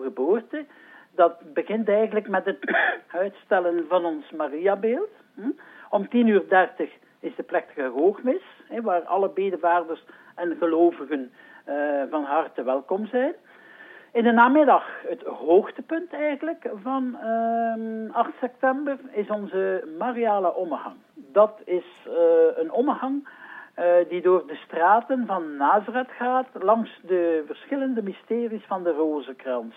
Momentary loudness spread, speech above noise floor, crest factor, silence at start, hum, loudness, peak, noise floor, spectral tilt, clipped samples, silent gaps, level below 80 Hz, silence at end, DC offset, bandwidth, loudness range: 13 LU; 24 dB; 18 dB; 0 s; none; -24 LUFS; -4 dBFS; -48 dBFS; -8.5 dB/octave; under 0.1%; none; under -90 dBFS; 0.05 s; under 0.1%; 3.9 kHz; 4 LU